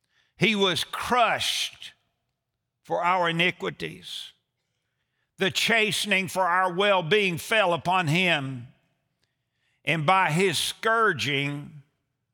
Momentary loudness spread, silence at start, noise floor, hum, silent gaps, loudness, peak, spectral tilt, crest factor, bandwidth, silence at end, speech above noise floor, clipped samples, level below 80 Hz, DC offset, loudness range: 15 LU; 0.4 s; -82 dBFS; none; none; -23 LUFS; -6 dBFS; -3.5 dB/octave; 20 dB; over 20 kHz; 0.55 s; 57 dB; under 0.1%; -68 dBFS; under 0.1%; 6 LU